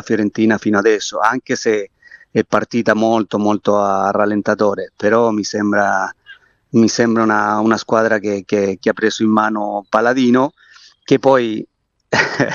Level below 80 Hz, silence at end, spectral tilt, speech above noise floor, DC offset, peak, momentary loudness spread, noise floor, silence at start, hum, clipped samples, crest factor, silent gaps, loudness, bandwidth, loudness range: -60 dBFS; 0 s; -5 dB/octave; 29 dB; under 0.1%; 0 dBFS; 6 LU; -44 dBFS; 0.05 s; none; under 0.1%; 16 dB; none; -16 LUFS; 7.4 kHz; 1 LU